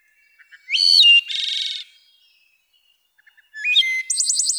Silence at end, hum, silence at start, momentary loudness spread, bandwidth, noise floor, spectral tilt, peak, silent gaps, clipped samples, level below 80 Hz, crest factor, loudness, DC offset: 0 s; none; 0.7 s; 15 LU; over 20 kHz; -63 dBFS; 11.5 dB/octave; -4 dBFS; none; under 0.1%; under -90 dBFS; 16 dB; -15 LUFS; under 0.1%